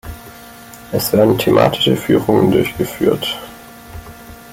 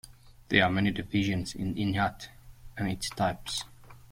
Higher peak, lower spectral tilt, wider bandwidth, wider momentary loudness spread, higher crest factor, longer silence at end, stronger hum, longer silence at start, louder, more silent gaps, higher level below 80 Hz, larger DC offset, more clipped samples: first, -2 dBFS vs -8 dBFS; about the same, -5.5 dB/octave vs -5 dB/octave; about the same, 17 kHz vs 16.5 kHz; first, 24 LU vs 18 LU; second, 14 dB vs 24 dB; second, 0 s vs 0.15 s; neither; about the same, 0.05 s vs 0.05 s; first, -15 LUFS vs -29 LUFS; neither; first, -42 dBFS vs -52 dBFS; neither; neither